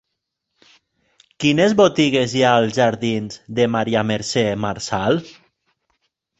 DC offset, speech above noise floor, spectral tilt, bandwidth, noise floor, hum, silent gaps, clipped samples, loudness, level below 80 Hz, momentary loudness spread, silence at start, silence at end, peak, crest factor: under 0.1%; 60 dB; -5 dB/octave; 8.2 kHz; -78 dBFS; none; none; under 0.1%; -18 LUFS; -54 dBFS; 8 LU; 1.4 s; 1.1 s; -2 dBFS; 18 dB